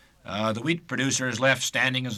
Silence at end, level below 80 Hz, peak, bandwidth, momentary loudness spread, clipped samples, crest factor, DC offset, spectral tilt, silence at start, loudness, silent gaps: 0 s; -64 dBFS; -10 dBFS; 14.5 kHz; 6 LU; under 0.1%; 18 dB; under 0.1%; -3.5 dB/octave; 0.25 s; -25 LUFS; none